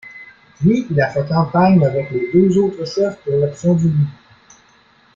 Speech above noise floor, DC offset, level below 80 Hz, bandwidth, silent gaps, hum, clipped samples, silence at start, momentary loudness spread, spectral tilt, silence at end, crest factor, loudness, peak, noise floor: 37 dB; under 0.1%; -50 dBFS; 7.4 kHz; none; none; under 0.1%; 0.05 s; 7 LU; -8 dB/octave; 1.05 s; 14 dB; -16 LUFS; -2 dBFS; -52 dBFS